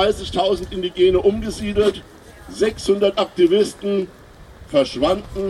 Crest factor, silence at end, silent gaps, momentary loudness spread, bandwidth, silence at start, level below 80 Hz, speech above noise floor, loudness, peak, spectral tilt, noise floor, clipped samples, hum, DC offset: 16 dB; 0 s; none; 9 LU; 12.5 kHz; 0 s; -40 dBFS; 23 dB; -19 LUFS; -4 dBFS; -5.5 dB/octave; -42 dBFS; under 0.1%; none; under 0.1%